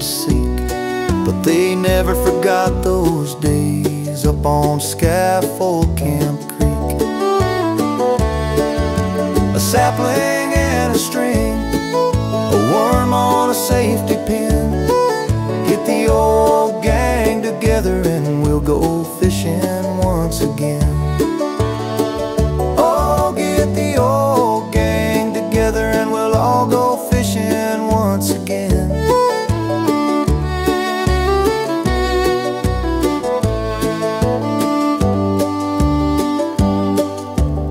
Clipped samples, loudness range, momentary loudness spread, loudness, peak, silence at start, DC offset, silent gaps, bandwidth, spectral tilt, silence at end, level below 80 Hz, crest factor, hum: under 0.1%; 2 LU; 4 LU; -16 LUFS; -2 dBFS; 0 s; under 0.1%; none; 16 kHz; -6 dB/octave; 0 s; -26 dBFS; 14 dB; none